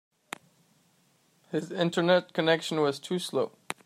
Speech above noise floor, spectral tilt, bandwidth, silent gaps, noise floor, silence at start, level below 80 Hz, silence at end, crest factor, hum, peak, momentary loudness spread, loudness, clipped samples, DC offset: 40 dB; -5 dB/octave; 15 kHz; none; -67 dBFS; 1.5 s; -80 dBFS; 0.15 s; 20 dB; none; -10 dBFS; 19 LU; -28 LUFS; under 0.1%; under 0.1%